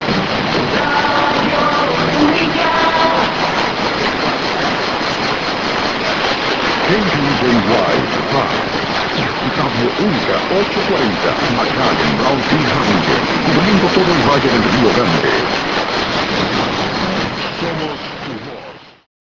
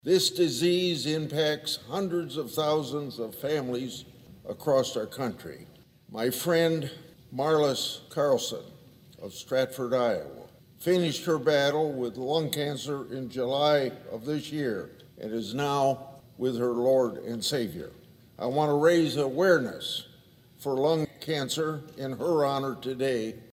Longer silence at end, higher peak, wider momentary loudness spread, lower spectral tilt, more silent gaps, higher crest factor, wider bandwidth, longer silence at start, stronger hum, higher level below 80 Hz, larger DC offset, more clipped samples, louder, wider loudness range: first, 0.3 s vs 0.1 s; first, 0 dBFS vs -10 dBFS; second, 5 LU vs 14 LU; about the same, -5 dB/octave vs -4.5 dB/octave; neither; about the same, 16 dB vs 18 dB; second, 8 kHz vs 16 kHz; about the same, 0 s vs 0.05 s; neither; first, -40 dBFS vs -66 dBFS; first, 0.3% vs under 0.1%; neither; first, -14 LUFS vs -28 LUFS; about the same, 3 LU vs 4 LU